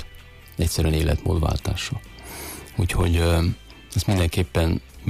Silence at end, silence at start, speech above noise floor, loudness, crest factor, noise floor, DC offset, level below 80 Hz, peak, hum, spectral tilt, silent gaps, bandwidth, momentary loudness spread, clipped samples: 0 s; 0 s; 22 dB; -23 LUFS; 12 dB; -44 dBFS; under 0.1%; -30 dBFS; -10 dBFS; none; -5.5 dB/octave; none; 15.5 kHz; 14 LU; under 0.1%